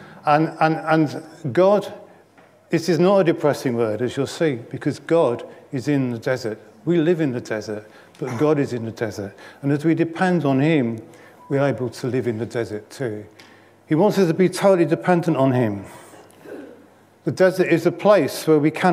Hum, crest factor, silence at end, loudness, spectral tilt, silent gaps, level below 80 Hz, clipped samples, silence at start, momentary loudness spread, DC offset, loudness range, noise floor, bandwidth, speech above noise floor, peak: none; 18 dB; 0 s; -20 LUFS; -7 dB/octave; none; -70 dBFS; under 0.1%; 0 s; 14 LU; under 0.1%; 3 LU; -52 dBFS; 15.5 kHz; 32 dB; -2 dBFS